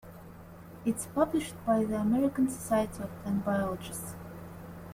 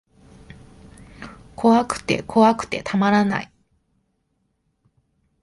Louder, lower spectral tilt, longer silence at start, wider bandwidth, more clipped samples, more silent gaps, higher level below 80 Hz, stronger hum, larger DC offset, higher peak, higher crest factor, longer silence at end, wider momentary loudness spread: second, -31 LUFS vs -19 LUFS; about the same, -6 dB/octave vs -6 dB/octave; second, 0.05 s vs 1.2 s; first, 16.5 kHz vs 11.5 kHz; neither; neither; about the same, -56 dBFS vs -52 dBFS; neither; neither; second, -14 dBFS vs -4 dBFS; about the same, 18 dB vs 20 dB; second, 0 s vs 2 s; second, 19 LU vs 23 LU